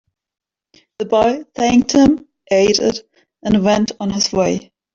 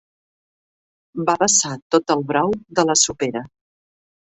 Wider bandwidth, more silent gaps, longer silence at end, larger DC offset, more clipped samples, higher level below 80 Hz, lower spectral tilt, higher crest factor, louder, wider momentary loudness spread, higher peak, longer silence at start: about the same, 7.8 kHz vs 8.4 kHz; second, none vs 1.82-1.90 s; second, 0.35 s vs 0.85 s; neither; neither; first, -46 dBFS vs -56 dBFS; first, -4.5 dB/octave vs -2.5 dB/octave; second, 14 dB vs 20 dB; about the same, -16 LUFS vs -18 LUFS; about the same, 11 LU vs 10 LU; about the same, -2 dBFS vs -2 dBFS; second, 1 s vs 1.15 s